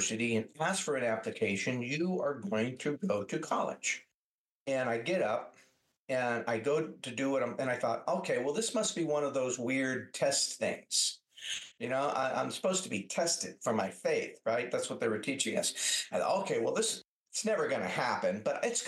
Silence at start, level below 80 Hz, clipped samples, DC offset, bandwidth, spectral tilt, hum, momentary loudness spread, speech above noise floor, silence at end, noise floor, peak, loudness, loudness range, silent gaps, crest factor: 0 s; -84 dBFS; under 0.1%; under 0.1%; 12.5 kHz; -3 dB/octave; none; 5 LU; over 57 dB; 0 s; under -90 dBFS; -16 dBFS; -33 LUFS; 3 LU; 4.14-4.66 s, 5.97-6.08 s, 17.07-17.24 s; 18 dB